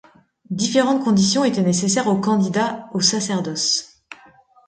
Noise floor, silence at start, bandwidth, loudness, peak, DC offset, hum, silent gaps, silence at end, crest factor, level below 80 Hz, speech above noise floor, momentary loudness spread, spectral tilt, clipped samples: -51 dBFS; 0.5 s; 9.6 kHz; -19 LUFS; -4 dBFS; under 0.1%; none; none; 0.55 s; 16 dB; -60 dBFS; 32 dB; 6 LU; -4 dB/octave; under 0.1%